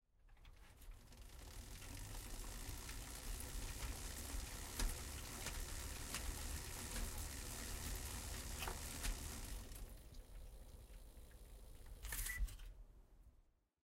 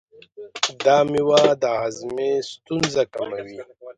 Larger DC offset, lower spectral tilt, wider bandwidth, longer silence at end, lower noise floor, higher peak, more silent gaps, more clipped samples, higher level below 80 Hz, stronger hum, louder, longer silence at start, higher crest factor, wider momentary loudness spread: neither; second, -2.5 dB/octave vs -4 dB/octave; first, 16 kHz vs 9.6 kHz; first, 0.4 s vs 0.05 s; first, -74 dBFS vs -42 dBFS; second, -28 dBFS vs 0 dBFS; neither; neither; first, -52 dBFS vs -60 dBFS; neither; second, -49 LUFS vs -21 LUFS; second, 0.15 s vs 0.4 s; about the same, 20 dB vs 20 dB; about the same, 16 LU vs 15 LU